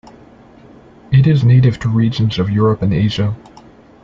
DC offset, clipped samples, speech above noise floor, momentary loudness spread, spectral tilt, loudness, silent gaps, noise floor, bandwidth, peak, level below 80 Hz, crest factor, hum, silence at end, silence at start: under 0.1%; under 0.1%; 29 dB; 8 LU; -8.5 dB/octave; -14 LUFS; none; -42 dBFS; 7.2 kHz; -2 dBFS; -40 dBFS; 14 dB; none; 0.65 s; 1.1 s